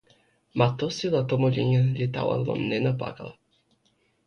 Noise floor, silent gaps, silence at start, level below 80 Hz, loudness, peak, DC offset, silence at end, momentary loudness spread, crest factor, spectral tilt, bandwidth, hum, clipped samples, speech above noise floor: -68 dBFS; none; 0.55 s; -58 dBFS; -26 LUFS; -8 dBFS; under 0.1%; 0.95 s; 12 LU; 20 dB; -7.5 dB/octave; 6.8 kHz; none; under 0.1%; 44 dB